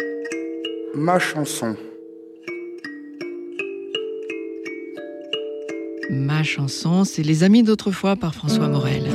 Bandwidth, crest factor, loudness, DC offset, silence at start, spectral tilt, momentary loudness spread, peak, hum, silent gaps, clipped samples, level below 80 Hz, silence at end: 14.5 kHz; 16 dB; -22 LUFS; under 0.1%; 0 s; -6 dB/octave; 15 LU; -6 dBFS; none; none; under 0.1%; -56 dBFS; 0 s